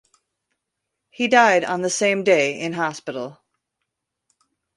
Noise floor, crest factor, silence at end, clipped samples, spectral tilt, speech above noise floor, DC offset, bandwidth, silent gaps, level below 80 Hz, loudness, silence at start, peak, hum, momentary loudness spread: -80 dBFS; 20 dB; 1.45 s; under 0.1%; -3.5 dB/octave; 61 dB; under 0.1%; 11.5 kHz; none; -70 dBFS; -19 LUFS; 1.2 s; -2 dBFS; none; 16 LU